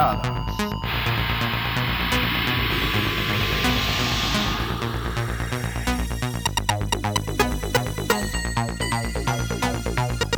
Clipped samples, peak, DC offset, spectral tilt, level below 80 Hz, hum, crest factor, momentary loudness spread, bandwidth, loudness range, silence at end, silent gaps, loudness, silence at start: under 0.1%; -2 dBFS; under 0.1%; -4 dB/octave; -32 dBFS; none; 22 dB; 5 LU; over 20 kHz; 3 LU; 0 s; none; -23 LUFS; 0 s